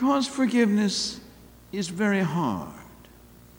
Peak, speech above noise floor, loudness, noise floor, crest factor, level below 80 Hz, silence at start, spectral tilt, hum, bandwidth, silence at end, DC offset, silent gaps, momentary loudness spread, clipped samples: -10 dBFS; 26 dB; -25 LUFS; -51 dBFS; 16 dB; -58 dBFS; 0 s; -5 dB/octave; none; 18 kHz; 0.65 s; under 0.1%; none; 17 LU; under 0.1%